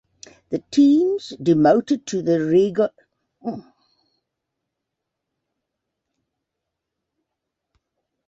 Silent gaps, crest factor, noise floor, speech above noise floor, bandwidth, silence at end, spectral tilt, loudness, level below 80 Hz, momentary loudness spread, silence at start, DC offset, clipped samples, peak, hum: none; 20 dB; -82 dBFS; 63 dB; 8 kHz; 4.65 s; -6.5 dB/octave; -19 LUFS; -64 dBFS; 16 LU; 0.5 s; under 0.1%; under 0.1%; -2 dBFS; none